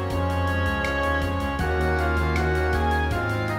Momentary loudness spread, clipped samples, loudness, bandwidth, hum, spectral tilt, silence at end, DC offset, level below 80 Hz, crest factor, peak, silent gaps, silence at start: 2 LU; under 0.1%; -24 LUFS; 16 kHz; none; -6.5 dB/octave; 0 s; under 0.1%; -30 dBFS; 12 dB; -10 dBFS; none; 0 s